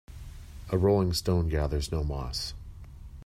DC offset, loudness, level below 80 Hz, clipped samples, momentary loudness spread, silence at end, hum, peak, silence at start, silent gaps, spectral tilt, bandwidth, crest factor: under 0.1%; -29 LUFS; -38 dBFS; under 0.1%; 22 LU; 0 s; none; -12 dBFS; 0.1 s; none; -6 dB/octave; 16 kHz; 18 dB